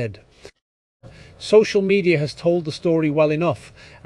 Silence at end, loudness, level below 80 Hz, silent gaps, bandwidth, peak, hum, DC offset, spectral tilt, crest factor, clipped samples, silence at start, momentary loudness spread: 0.4 s; -19 LUFS; -56 dBFS; 0.62-1.00 s; 11 kHz; -4 dBFS; none; under 0.1%; -6.5 dB/octave; 18 dB; under 0.1%; 0 s; 11 LU